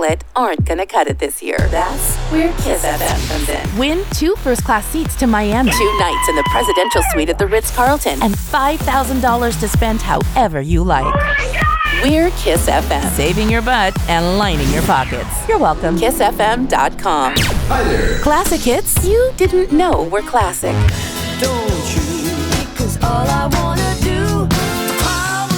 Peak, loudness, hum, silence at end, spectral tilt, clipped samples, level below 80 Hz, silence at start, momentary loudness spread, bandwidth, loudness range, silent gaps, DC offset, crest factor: -2 dBFS; -15 LUFS; none; 0 s; -4.5 dB/octave; under 0.1%; -22 dBFS; 0 s; 4 LU; over 20 kHz; 3 LU; none; under 0.1%; 14 dB